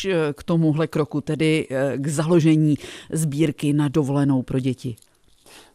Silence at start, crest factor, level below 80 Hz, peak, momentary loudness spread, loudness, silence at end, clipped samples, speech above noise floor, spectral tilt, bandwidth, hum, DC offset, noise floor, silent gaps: 0 s; 14 dB; -54 dBFS; -6 dBFS; 9 LU; -21 LUFS; 0.15 s; under 0.1%; 31 dB; -6.5 dB/octave; 14.5 kHz; none; under 0.1%; -52 dBFS; none